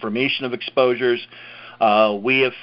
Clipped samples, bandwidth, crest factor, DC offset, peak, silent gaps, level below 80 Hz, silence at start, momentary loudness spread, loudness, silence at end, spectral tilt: under 0.1%; 5.6 kHz; 16 dB; under 0.1%; -4 dBFS; none; -68 dBFS; 0 s; 18 LU; -19 LUFS; 0 s; -9.5 dB/octave